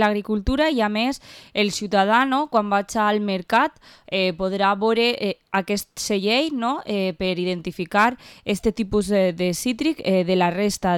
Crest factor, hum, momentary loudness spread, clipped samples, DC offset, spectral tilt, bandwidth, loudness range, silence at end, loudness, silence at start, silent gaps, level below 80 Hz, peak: 14 dB; none; 6 LU; under 0.1%; under 0.1%; -4.5 dB/octave; 17.5 kHz; 2 LU; 0 s; -22 LUFS; 0 s; none; -44 dBFS; -6 dBFS